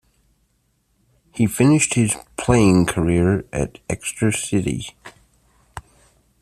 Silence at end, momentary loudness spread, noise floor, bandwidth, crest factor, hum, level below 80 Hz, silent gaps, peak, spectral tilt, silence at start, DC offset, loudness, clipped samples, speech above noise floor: 0.6 s; 22 LU; -66 dBFS; 14.5 kHz; 18 dB; none; -42 dBFS; none; -2 dBFS; -5.5 dB/octave; 1.35 s; under 0.1%; -19 LUFS; under 0.1%; 47 dB